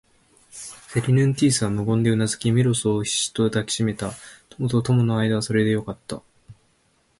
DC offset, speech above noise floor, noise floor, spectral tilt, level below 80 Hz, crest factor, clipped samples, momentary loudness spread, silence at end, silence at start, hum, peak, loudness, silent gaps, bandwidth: under 0.1%; 43 dB; -64 dBFS; -5.5 dB/octave; -52 dBFS; 16 dB; under 0.1%; 17 LU; 0.65 s; 0.55 s; none; -8 dBFS; -22 LUFS; none; 11.5 kHz